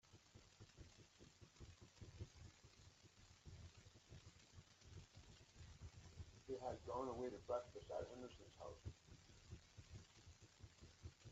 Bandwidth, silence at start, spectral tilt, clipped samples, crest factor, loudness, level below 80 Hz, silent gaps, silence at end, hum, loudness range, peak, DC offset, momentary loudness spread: 8 kHz; 0.05 s; -5.5 dB/octave; under 0.1%; 22 dB; -57 LUFS; -70 dBFS; none; 0 s; none; 12 LU; -34 dBFS; under 0.1%; 18 LU